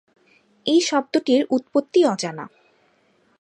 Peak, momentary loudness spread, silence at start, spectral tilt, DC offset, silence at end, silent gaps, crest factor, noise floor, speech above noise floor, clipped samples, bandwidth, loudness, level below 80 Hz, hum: -6 dBFS; 11 LU; 0.65 s; -4 dB/octave; under 0.1%; 0.95 s; none; 16 dB; -62 dBFS; 42 dB; under 0.1%; 11 kHz; -20 LUFS; -76 dBFS; none